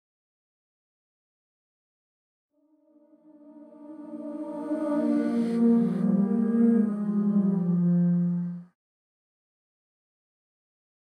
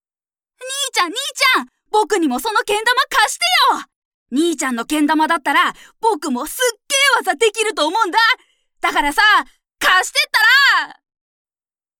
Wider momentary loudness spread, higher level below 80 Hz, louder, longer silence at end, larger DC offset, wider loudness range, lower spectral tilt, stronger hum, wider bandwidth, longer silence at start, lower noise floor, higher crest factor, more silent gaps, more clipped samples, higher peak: first, 16 LU vs 9 LU; second, -82 dBFS vs -50 dBFS; second, -25 LUFS vs -15 LUFS; first, 2.5 s vs 1.05 s; neither; first, 13 LU vs 3 LU; first, -10.5 dB/octave vs 0 dB/octave; neither; second, 9 kHz vs 19 kHz; first, 3.45 s vs 0.6 s; second, -63 dBFS vs under -90 dBFS; about the same, 16 dB vs 16 dB; second, none vs 3.96-4.26 s; neither; second, -12 dBFS vs -2 dBFS